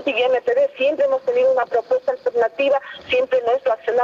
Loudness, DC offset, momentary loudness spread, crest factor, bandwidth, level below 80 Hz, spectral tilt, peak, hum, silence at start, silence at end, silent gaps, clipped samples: -19 LUFS; under 0.1%; 4 LU; 12 dB; 7.2 kHz; -64 dBFS; -4 dB/octave; -8 dBFS; none; 0 s; 0 s; none; under 0.1%